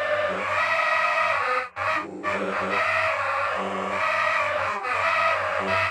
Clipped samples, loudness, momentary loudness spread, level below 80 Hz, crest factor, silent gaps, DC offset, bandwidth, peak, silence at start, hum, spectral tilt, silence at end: under 0.1%; -23 LUFS; 5 LU; -64 dBFS; 16 dB; none; under 0.1%; 15 kHz; -8 dBFS; 0 s; none; -3.5 dB/octave; 0 s